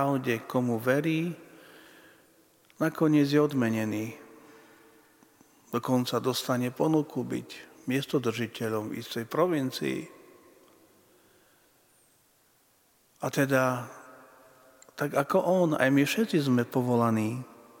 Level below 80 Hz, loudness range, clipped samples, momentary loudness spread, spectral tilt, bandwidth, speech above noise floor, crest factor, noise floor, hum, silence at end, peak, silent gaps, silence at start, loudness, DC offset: -76 dBFS; 7 LU; under 0.1%; 13 LU; -6 dB/octave; 17 kHz; 39 dB; 22 dB; -66 dBFS; none; 0.25 s; -8 dBFS; none; 0 s; -28 LUFS; under 0.1%